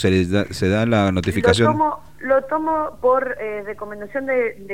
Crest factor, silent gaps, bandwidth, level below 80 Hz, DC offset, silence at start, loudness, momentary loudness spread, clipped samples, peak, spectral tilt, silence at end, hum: 18 dB; none; 16 kHz; -46 dBFS; 0.8%; 0 s; -20 LUFS; 12 LU; under 0.1%; -2 dBFS; -6 dB/octave; 0 s; none